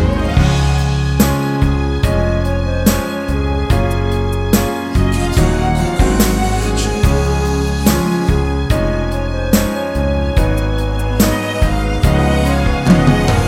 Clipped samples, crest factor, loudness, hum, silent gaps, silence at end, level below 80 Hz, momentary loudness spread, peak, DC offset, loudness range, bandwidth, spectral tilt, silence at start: under 0.1%; 14 dB; -15 LUFS; none; none; 0 s; -18 dBFS; 4 LU; 0 dBFS; under 0.1%; 1 LU; 17 kHz; -6 dB/octave; 0 s